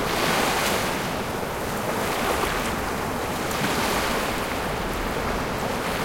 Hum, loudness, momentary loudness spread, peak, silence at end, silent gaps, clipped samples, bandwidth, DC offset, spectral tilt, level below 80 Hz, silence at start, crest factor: none; -25 LUFS; 5 LU; -10 dBFS; 0 s; none; under 0.1%; 17 kHz; under 0.1%; -3.5 dB/octave; -40 dBFS; 0 s; 16 dB